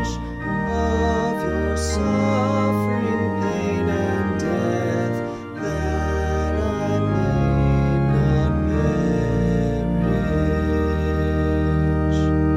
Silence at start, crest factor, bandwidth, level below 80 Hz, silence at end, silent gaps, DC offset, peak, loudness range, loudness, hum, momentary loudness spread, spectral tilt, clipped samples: 0 s; 12 dB; 12.5 kHz; -28 dBFS; 0 s; none; under 0.1%; -8 dBFS; 3 LU; -21 LUFS; none; 4 LU; -7.5 dB/octave; under 0.1%